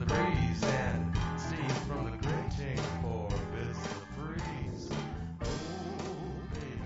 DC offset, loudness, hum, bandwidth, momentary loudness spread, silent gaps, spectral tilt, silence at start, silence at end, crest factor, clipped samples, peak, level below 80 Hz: under 0.1%; -35 LUFS; none; 7.6 kHz; 9 LU; none; -5.5 dB/octave; 0 s; 0 s; 18 dB; under 0.1%; -16 dBFS; -44 dBFS